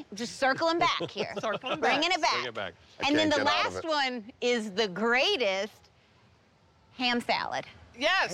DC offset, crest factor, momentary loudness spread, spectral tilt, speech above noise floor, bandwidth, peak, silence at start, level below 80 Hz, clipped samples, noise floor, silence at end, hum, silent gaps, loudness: under 0.1%; 14 dB; 10 LU; -3 dB/octave; 34 dB; 14 kHz; -16 dBFS; 0 s; -66 dBFS; under 0.1%; -63 dBFS; 0 s; none; none; -28 LUFS